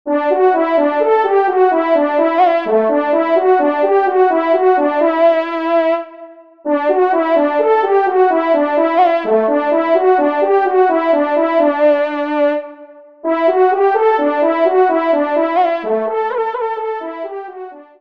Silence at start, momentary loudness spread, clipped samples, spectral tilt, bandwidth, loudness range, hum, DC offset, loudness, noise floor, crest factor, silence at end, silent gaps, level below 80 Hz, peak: 0.05 s; 8 LU; under 0.1%; -6.5 dB/octave; 5.6 kHz; 2 LU; none; 0.3%; -14 LUFS; -39 dBFS; 12 dB; 0.15 s; none; -68 dBFS; -2 dBFS